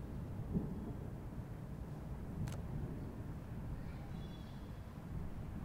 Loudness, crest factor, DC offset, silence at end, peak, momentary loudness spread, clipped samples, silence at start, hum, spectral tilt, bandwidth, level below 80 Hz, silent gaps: -47 LUFS; 18 dB; under 0.1%; 0 s; -28 dBFS; 7 LU; under 0.1%; 0 s; none; -8 dB/octave; 16 kHz; -52 dBFS; none